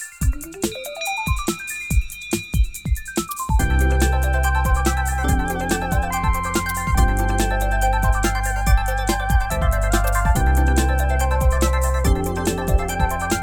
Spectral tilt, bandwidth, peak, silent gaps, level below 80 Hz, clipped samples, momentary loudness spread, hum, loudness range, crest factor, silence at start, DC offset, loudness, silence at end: -5 dB/octave; 18 kHz; -4 dBFS; none; -20 dBFS; under 0.1%; 6 LU; none; 3 LU; 14 dB; 0 s; 0.2%; -21 LUFS; 0 s